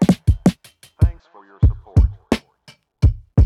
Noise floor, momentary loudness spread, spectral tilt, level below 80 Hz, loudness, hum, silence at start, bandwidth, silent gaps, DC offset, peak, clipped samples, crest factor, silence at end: -51 dBFS; 7 LU; -8 dB/octave; -22 dBFS; -19 LUFS; none; 0 s; 13 kHz; none; under 0.1%; -2 dBFS; under 0.1%; 14 dB; 0 s